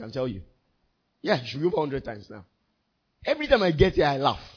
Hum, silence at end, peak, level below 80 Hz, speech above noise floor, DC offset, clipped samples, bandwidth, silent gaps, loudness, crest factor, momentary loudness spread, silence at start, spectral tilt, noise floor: none; 0.1 s; -4 dBFS; -44 dBFS; 49 dB; under 0.1%; under 0.1%; 5.4 kHz; none; -25 LUFS; 22 dB; 14 LU; 0 s; -7 dB/octave; -74 dBFS